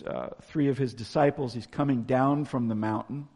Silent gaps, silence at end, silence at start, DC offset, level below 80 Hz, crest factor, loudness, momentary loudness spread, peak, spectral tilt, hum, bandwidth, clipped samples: none; 0.1 s; 0 s; under 0.1%; -60 dBFS; 18 dB; -28 LUFS; 9 LU; -10 dBFS; -8 dB/octave; none; 11 kHz; under 0.1%